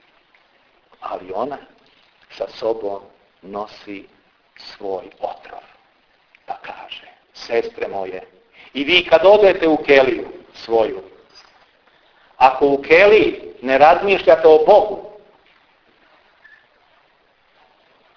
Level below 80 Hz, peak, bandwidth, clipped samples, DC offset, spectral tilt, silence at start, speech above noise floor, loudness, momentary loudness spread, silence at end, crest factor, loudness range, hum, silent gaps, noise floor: -52 dBFS; 0 dBFS; 5.4 kHz; under 0.1%; under 0.1%; -5 dB/octave; 1 s; 43 dB; -15 LUFS; 24 LU; 3.05 s; 18 dB; 19 LU; none; none; -58 dBFS